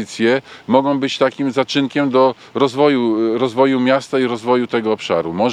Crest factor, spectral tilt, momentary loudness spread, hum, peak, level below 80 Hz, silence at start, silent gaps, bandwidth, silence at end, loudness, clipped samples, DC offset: 16 dB; -5.5 dB/octave; 5 LU; none; 0 dBFS; -64 dBFS; 0 s; none; 10.5 kHz; 0 s; -16 LUFS; under 0.1%; under 0.1%